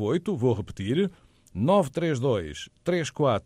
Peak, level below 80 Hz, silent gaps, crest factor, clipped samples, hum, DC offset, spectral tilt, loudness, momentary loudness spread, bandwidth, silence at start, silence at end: -10 dBFS; -54 dBFS; none; 16 dB; under 0.1%; none; under 0.1%; -6.5 dB/octave; -26 LUFS; 8 LU; 14.5 kHz; 0 s; 0.05 s